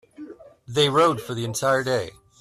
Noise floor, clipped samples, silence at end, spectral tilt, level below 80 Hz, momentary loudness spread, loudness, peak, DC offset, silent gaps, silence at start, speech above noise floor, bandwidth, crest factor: -42 dBFS; under 0.1%; 0.3 s; -4 dB/octave; -60 dBFS; 24 LU; -22 LUFS; -8 dBFS; under 0.1%; none; 0.2 s; 20 dB; 15 kHz; 16 dB